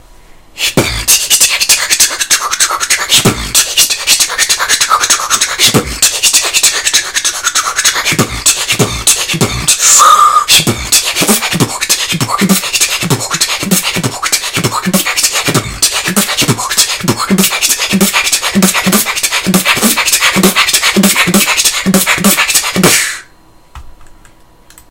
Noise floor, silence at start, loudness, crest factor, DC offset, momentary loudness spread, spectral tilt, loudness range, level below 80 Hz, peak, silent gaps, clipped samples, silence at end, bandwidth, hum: -42 dBFS; 0.55 s; -8 LUFS; 10 dB; 0.5%; 5 LU; -1.5 dB/octave; 4 LU; -36 dBFS; 0 dBFS; none; 1%; 0.8 s; over 20 kHz; none